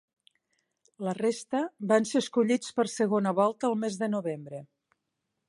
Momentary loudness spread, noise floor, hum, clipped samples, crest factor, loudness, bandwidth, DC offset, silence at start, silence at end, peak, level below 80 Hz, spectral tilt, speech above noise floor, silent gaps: 11 LU; -83 dBFS; none; under 0.1%; 20 dB; -28 LUFS; 11.5 kHz; under 0.1%; 1 s; 0.85 s; -10 dBFS; -78 dBFS; -5 dB/octave; 55 dB; none